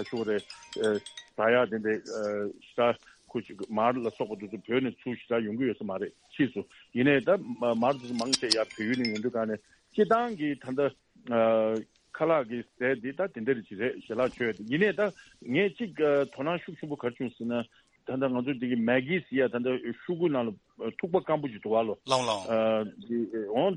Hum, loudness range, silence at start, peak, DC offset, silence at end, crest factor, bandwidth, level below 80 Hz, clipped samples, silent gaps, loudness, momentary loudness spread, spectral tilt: none; 3 LU; 0 s; -6 dBFS; under 0.1%; 0 s; 22 dB; 10.5 kHz; -70 dBFS; under 0.1%; none; -30 LUFS; 11 LU; -5 dB/octave